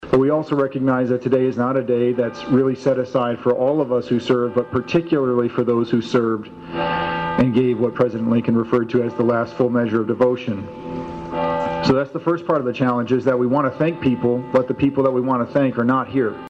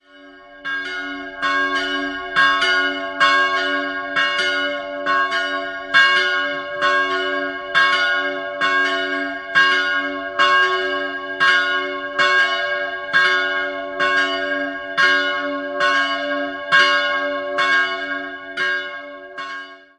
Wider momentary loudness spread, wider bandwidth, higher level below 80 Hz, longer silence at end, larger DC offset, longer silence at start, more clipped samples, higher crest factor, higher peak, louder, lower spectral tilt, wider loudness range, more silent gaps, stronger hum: second, 4 LU vs 10 LU; second, 7.8 kHz vs 10.5 kHz; first, -50 dBFS vs -60 dBFS; second, 0 s vs 0.2 s; neither; second, 0 s vs 0.15 s; neither; about the same, 14 dB vs 18 dB; second, -6 dBFS vs -2 dBFS; about the same, -19 LUFS vs -18 LUFS; first, -8 dB/octave vs -1.5 dB/octave; about the same, 2 LU vs 2 LU; neither; neither